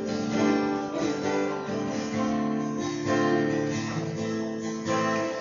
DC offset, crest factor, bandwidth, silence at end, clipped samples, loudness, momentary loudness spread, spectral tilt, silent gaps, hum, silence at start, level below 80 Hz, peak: under 0.1%; 14 dB; 7.6 kHz; 0 s; under 0.1%; -28 LUFS; 6 LU; -5.5 dB/octave; none; none; 0 s; -58 dBFS; -12 dBFS